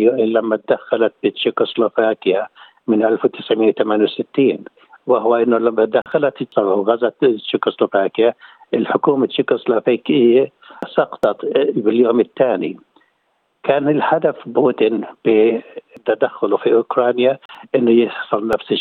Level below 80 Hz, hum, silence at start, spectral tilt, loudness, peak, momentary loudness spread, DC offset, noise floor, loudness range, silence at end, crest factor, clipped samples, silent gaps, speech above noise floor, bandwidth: -64 dBFS; none; 0 s; -8 dB/octave; -17 LUFS; -2 dBFS; 7 LU; under 0.1%; -66 dBFS; 1 LU; 0 s; 14 dB; under 0.1%; 17.45-17.49 s; 49 dB; 4.4 kHz